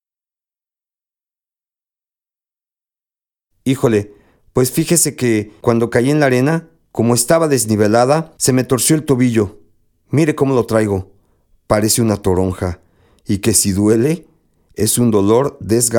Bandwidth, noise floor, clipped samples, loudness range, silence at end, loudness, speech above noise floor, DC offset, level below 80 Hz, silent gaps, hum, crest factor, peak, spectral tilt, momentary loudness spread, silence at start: 19 kHz; under -90 dBFS; under 0.1%; 6 LU; 0 s; -15 LUFS; over 76 dB; under 0.1%; -46 dBFS; none; none; 16 dB; 0 dBFS; -5 dB/octave; 10 LU; 3.65 s